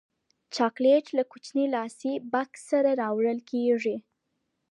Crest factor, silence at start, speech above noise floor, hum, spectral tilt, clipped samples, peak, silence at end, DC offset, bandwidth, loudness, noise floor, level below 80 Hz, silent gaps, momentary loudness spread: 16 dB; 0.5 s; 53 dB; none; -5 dB/octave; under 0.1%; -10 dBFS; 0.7 s; under 0.1%; 11 kHz; -27 LUFS; -79 dBFS; -86 dBFS; none; 9 LU